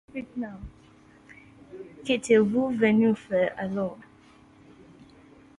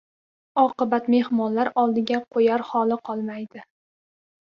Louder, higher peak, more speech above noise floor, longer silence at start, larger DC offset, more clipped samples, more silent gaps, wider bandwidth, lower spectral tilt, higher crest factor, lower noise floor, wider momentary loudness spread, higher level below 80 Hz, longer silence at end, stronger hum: about the same, -25 LUFS vs -23 LUFS; about the same, -8 dBFS vs -6 dBFS; second, 31 dB vs over 68 dB; second, 0.15 s vs 0.55 s; neither; neither; neither; first, 11 kHz vs 6.8 kHz; about the same, -6 dB/octave vs -7 dB/octave; about the same, 20 dB vs 18 dB; second, -55 dBFS vs under -90 dBFS; first, 23 LU vs 9 LU; first, -58 dBFS vs -70 dBFS; first, 1.55 s vs 0.85 s; neither